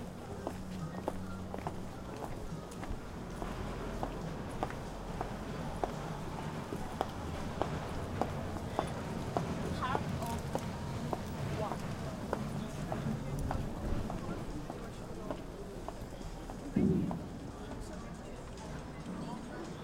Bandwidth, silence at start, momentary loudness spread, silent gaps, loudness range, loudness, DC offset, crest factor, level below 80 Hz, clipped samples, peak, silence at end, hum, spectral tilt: 16 kHz; 0 s; 8 LU; none; 4 LU; -40 LUFS; under 0.1%; 24 dB; -48 dBFS; under 0.1%; -14 dBFS; 0 s; none; -6.5 dB/octave